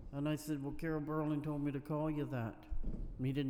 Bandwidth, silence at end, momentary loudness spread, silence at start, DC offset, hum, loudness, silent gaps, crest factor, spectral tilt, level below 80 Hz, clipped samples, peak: 16.5 kHz; 0 s; 8 LU; 0 s; under 0.1%; none; -40 LUFS; none; 14 dB; -7.5 dB/octave; -48 dBFS; under 0.1%; -26 dBFS